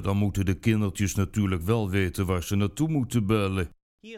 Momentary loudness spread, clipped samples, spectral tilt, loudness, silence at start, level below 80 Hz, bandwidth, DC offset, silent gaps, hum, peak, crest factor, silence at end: 3 LU; under 0.1%; -6.5 dB/octave; -26 LUFS; 0 s; -44 dBFS; 16 kHz; under 0.1%; 3.82-3.98 s; none; -10 dBFS; 16 dB; 0 s